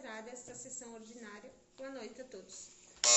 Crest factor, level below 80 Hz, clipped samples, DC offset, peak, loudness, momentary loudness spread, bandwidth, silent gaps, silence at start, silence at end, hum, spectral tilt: 26 dB; -76 dBFS; under 0.1%; under 0.1%; -12 dBFS; -44 LUFS; 7 LU; 8.4 kHz; none; 0 s; 0 s; none; 1 dB/octave